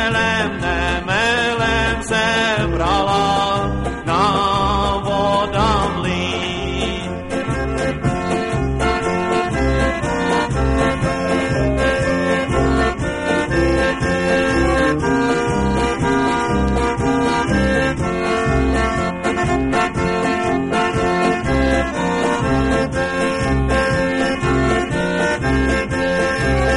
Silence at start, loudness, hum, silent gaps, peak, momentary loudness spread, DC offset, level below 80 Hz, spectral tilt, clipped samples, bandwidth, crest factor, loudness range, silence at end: 0 s; -18 LUFS; none; none; -2 dBFS; 4 LU; 0.3%; -28 dBFS; -5.5 dB/octave; under 0.1%; 11.5 kHz; 16 dB; 2 LU; 0 s